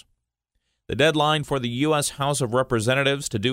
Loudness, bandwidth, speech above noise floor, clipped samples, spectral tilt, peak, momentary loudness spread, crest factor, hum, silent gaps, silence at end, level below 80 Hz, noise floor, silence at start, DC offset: -22 LUFS; 16 kHz; 55 dB; under 0.1%; -4.5 dB/octave; -4 dBFS; 5 LU; 20 dB; none; none; 0 s; -52 dBFS; -77 dBFS; 0.9 s; under 0.1%